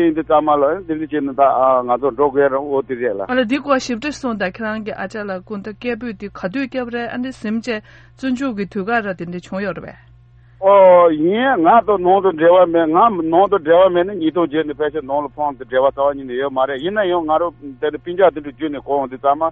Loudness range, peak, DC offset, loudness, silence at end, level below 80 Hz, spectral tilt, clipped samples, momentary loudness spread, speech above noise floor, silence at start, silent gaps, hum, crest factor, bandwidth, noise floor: 11 LU; 0 dBFS; under 0.1%; -17 LUFS; 0 s; -50 dBFS; -6 dB/octave; under 0.1%; 13 LU; 30 dB; 0 s; none; none; 16 dB; 8.4 kHz; -46 dBFS